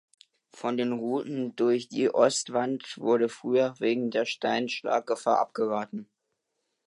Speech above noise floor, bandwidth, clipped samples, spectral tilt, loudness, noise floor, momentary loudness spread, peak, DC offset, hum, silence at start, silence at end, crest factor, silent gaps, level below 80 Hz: 53 dB; 11.5 kHz; under 0.1%; -4 dB/octave; -28 LUFS; -80 dBFS; 8 LU; -8 dBFS; under 0.1%; none; 0.55 s; 0.8 s; 20 dB; none; -82 dBFS